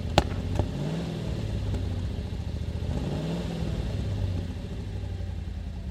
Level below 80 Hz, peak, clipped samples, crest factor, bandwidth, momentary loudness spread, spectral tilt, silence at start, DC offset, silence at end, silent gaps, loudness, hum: -36 dBFS; 0 dBFS; under 0.1%; 30 dB; 13 kHz; 6 LU; -6.5 dB/octave; 0 s; under 0.1%; 0 s; none; -32 LUFS; none